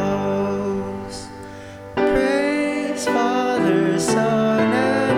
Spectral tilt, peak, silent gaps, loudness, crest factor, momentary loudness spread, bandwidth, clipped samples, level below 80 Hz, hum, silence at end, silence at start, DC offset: -5.5 dB/octave; -6 dBFS; none; -20 LUFS; 14 dB; 15 LU; 16 kHz; under 0.1%; -46 dBFS; none; 0 s; 0 s; under 0.1%